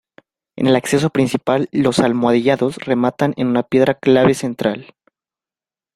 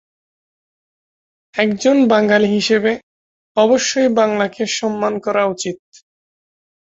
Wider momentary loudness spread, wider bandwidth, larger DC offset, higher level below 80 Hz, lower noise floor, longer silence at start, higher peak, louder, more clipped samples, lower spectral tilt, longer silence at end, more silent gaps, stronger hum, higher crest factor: second, 6 LU vs 11 LU; first, 14 kHz vs 8 kHz; neither; first, -54 dBFS vs -60 dBFS; about the same, under -90 dBFS vs under -90 dBFS; second, 0.55 s vs 1.55 s; about the same, -2 dBFS vs 0 dBFS; about the same, -16 LUFS vs -16 LUFS; neither; first, -6 dB/octave vs -4 dB/octave; about the same, 1.1 s vs 1.15 s; second, none vs 3.03-3.55 s; neither; about the same, 16 dB vs 18 dB